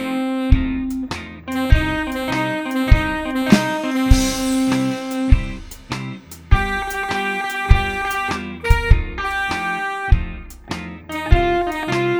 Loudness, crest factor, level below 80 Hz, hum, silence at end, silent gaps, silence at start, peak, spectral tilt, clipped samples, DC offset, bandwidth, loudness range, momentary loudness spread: -20 LUFS; 18 dB; -22 dBFS; none; 0 s; none; 0 s; 0 dBFS; -5.5 dB/octave; 0.1%; under 0.1%; over 20 kHz; 3 LU; 12 LU